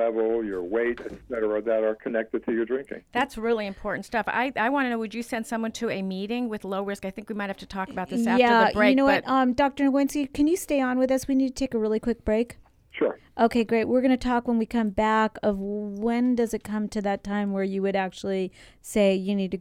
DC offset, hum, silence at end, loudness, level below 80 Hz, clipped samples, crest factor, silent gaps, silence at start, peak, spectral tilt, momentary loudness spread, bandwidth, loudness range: under 0.1%; none; 0 s; -25 LUFS; -52 dBFS; under 0.1%; 18 dB; none; 0 s; -6 dBFS; -5.5 dB/octave; 10 LU; 16 kHz; 6 LU